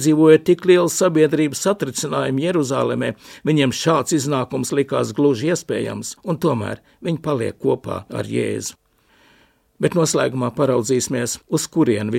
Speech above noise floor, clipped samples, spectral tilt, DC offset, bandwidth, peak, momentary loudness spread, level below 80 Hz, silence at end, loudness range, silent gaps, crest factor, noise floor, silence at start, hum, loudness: 38 dB; under 0.1%; -5 dB/octave; under 0.1%; 16.5 kHz; 0 dBFS; 11 LU; -58 dBFS; 0 s; 5 LU; none; 18 dB; -56 dBFS; 0 s; none; -19 LUFS